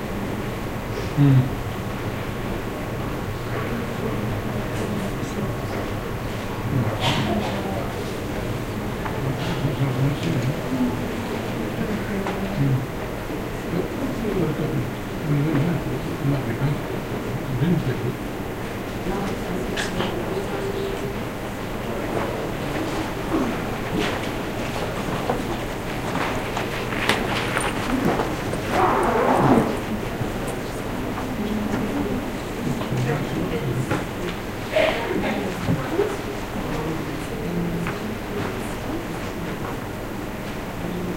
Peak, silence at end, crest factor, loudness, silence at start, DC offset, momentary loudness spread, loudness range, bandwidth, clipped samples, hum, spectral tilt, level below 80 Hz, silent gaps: -2 dBFS; 0 s; 22 dB; -25 LUFS; 0 s; under 0.1%; 7 LU; 5 LU; 16 kHz; under 0.1%; none; -6 dB/octave; -38 dBFS; none